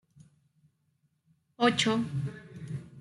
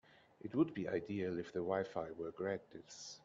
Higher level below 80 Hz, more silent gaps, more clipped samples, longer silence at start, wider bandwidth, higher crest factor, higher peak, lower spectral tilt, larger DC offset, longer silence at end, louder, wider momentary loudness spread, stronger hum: first, -70 dBFS vs -76 dBFS; neither; neither; first, 1.6 s vs 0.45 s; first, 11.5 kHz vs 7.8 kHz; about the same, 22 dB vs 20 dB; first, -12 dBFS vs -22 dBFS; second, -4.5 dB/octave vs -6 dB/octave; neither; about the same, 0 s vs 0.05 s; first, -30 LUFS vs -41 LUFS; about the same, 16 LU vs 14 LU; neither